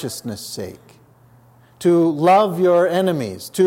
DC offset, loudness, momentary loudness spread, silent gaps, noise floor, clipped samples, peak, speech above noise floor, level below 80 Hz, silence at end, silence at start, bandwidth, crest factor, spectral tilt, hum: under 0.1%; -17 LUFS; 15 LU; none; -50 dBFS; under 0.1%; -4 dBFS; 33 dB; -66 dBFS; 0 s; 0 s; 16.5 kHz; 14 dB; -6 dB/octave; none